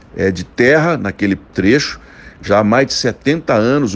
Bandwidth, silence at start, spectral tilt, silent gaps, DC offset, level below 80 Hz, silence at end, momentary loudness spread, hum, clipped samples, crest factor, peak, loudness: 9.8 kHz; 0.15 s; -5.5 dB/octave; none; under 0.1%; -44 dBFS; 0 s; 7 LU; none; under 0.1%; 14 dB; 0 dBFS; -14 LUFS